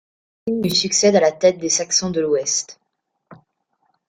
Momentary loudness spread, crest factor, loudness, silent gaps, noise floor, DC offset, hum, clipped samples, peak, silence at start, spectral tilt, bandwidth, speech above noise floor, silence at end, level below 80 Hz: 9 LU; 18 dB; -18 LUFS; none; -74 dBFS; under 0.1%; none; under 0.1%; -2 dBFS; 0.45 s; -3 dB/octave; 16.5 kHz; 56 dB; 0.75 s; -60 dBFS